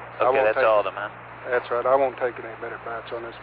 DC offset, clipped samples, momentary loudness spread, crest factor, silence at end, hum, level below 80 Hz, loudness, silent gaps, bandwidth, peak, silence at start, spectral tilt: under 0.1%; under 0.1%; 15 LU; 16 dB; 0 s; none; -58 dBFS; -23 LUFS; none; 4.9 kHz; -8 dBFS; 0 s; -8.5 dB/octave